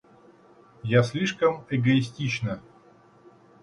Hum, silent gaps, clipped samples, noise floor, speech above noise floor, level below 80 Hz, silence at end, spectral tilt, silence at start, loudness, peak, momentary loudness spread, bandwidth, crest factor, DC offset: none; none; under 0.1%; -55 dBFS; 31 dB; -60 dBFS; 1.05 s; -6.5 dB/octave; 0.85 s; -25 LUFS; -6 dBFS; 10 LU; 11 kHz; 20 dB; under 0.1%